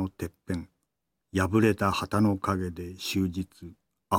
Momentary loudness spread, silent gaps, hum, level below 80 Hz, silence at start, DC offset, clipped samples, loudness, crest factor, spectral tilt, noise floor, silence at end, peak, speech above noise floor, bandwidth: 15 LU; none; none; -54 dBFS; 0 s; under 0.1%; under 0.1%; -28 LUFS; 20 dB; -6 dB/octave; -82 dBFS; 0 s; -10 dBFS; 54 dB; 17 kHz